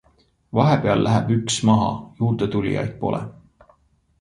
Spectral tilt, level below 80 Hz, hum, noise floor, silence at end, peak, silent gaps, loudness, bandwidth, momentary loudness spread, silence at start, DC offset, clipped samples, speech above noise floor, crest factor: -6 dB/octave; -48 dBFS; none; -60 dBFS; 0.9 s; -2 dBFS; none; -21 LUFS; 11 kHz; 8 LU; 0.55 s; under 0.1%; under 0.1%; 40 dB; 18 dB